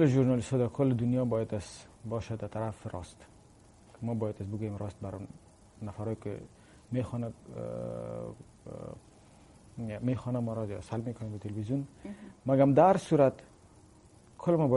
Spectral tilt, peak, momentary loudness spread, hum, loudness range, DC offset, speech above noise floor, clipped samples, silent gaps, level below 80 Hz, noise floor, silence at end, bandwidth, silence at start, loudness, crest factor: -8 dB/octave; -10 dBFS; 20 LU; none; 11 LU; under 0.1%; 27 dB; under 0.1%; none; -60 dBFS; -58 dBFS; 0 s; 11.5 kHz; 0 s; -32 LUFS; 22 dB